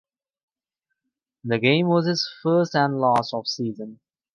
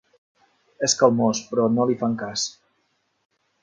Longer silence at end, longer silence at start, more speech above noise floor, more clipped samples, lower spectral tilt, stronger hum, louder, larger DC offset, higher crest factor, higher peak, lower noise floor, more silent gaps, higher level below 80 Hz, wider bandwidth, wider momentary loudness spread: second, 0.4 s vs 1.1 s; first, 1.45 s vs 0.8 s; first, 61 dB vs 49 dB; neither; first, -6 dB/octave vs -4 dB/octave; neither; about the same, -22 LUFS vs -22 LUFS; neither; about the same, 20 dB vs 22 dB; about the same, -4 dBFS vs -2 dBFS; first, -82 dBFS vs -70 dBFS; neither; about the same, -68 dBFS vs -66 dBFS; first, 11 kHz vs 9.6 kHz; first, 13 LU vs 9 LU